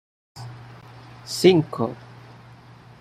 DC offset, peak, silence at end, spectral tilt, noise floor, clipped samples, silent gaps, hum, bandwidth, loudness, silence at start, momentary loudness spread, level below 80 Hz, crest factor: under 0.1%; -4 dBFS; 1 s; -5.5 dB/octave; -47 dBFS; under 0.1%; none; none; 15.5 kHz; -21 LUFS; 0.35 s; 27 LU; -62 dBFS; 22 dB